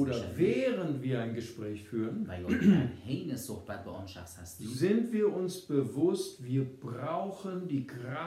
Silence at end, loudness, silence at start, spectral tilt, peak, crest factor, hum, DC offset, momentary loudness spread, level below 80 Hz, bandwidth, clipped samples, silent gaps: 0 s; -33 LUFS; 0 s; -7 dB/octave; -12 dBFS; 20 dB; none; under 0.1%; 13 LU; -70 dBFS; 15 kHz; under 0.1%; none